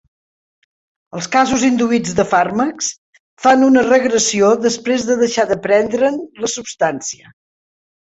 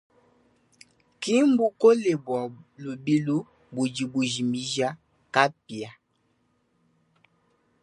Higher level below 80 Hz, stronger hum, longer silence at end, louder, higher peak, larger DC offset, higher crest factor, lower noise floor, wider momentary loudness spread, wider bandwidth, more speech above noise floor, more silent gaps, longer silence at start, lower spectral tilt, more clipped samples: first, -52 dBFS vs -72 dBFS; neither; second, 0.85 s vs 1.9 s; first, -15 LUFS vs -25 LUFS; about the same, -2 dBFS vs -2 dBFS; neither; second, 14 dB vs 24 dB; first, under -90 dBFS vs -70 dBFS; second, 11 LU vs 18 LU; second, 8.2 kHz vs 11.5 kHz; first, over 75 dB vs 46 dB; first, 2.98-3.13 s, 3.20-3.37 s vs none; about the same, 1.15 s vs 1.2 s; second, -3.5 dB/octave vs -5 dB/octave; neither